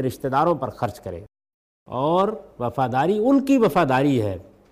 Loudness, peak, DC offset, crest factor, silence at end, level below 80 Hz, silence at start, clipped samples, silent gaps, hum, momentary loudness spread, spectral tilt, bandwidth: -21 LUFS; -8 dBFS; under 0.1%; 14 dB; 0.3 s; -54 dBFS; 0 s; under 0.1%; 1.54-1.86 s; none; 15 LU; -7 dB/octave; 15.5 kHz